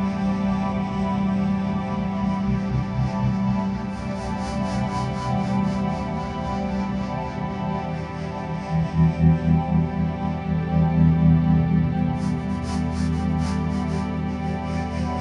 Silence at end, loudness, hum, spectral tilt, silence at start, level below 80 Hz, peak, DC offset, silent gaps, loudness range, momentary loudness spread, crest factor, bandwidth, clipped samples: 0 s; -24 LUFS; none; -8 dB/octave; 0 s; -36 dBFS; -6 dBFS; under 0.1%; none; 5 LU; 9 LU; 16 dB; 9.8 kHz; under 0.1%